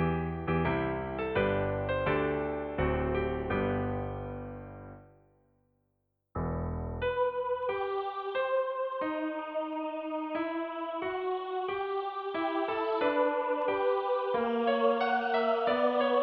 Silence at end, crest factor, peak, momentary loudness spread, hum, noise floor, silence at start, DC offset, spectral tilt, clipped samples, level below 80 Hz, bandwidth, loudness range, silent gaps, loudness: 0 s; 16 dB; -16 dBFS; 8 LU; none; -79 dBFS; 0 s; under 0.1%; -9.5 dB/octave; under 0.1%; -48 dBFS; 5.6 kHz; 8 LU; none; -31 LUFS